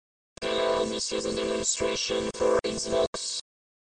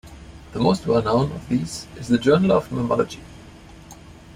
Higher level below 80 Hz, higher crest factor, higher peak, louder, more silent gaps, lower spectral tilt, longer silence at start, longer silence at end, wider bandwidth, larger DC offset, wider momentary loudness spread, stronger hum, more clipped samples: second, -52 dBFS vs -46 dBFS; about the same, 16 dB vs 18 dB; second, -12 dBFS vs -6 dBFS; second, -28 LUFS vs -21 LUFS; first, 3.07-3.13 s vs none; second, -2.5 dB/octave vs -6.5 dB/octave; first, 0.4 s vs 0.05 s; first, 0.5 s vs 0 s; second, 10 kHz vs 14.5 kHz; neither; second, 6 LU vs 15 LU; neither; neither